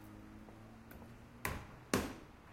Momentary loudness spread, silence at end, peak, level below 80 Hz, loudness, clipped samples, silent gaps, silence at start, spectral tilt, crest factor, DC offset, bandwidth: 17 LU; 0 s; -16 dBFS; -58 dBFS; -42 LUFS; under 0.1%; none; 0 s; -4.5 dB/octave; 28 dB; under 0.1%; 16.5 kHz